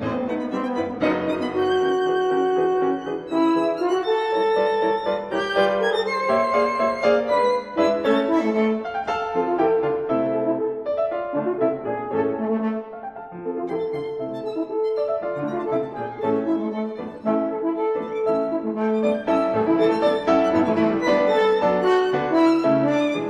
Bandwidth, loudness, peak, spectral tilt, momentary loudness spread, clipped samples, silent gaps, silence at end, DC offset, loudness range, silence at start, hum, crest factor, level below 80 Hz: 9.6 kHz; -22 LUFS; -6 dBFS; -6.5 dB/octave; 8 LU; under 0.1%; none; 0 s; under 0.1%; 6 LU; 0 s; none; 16 dB; -58 dBFS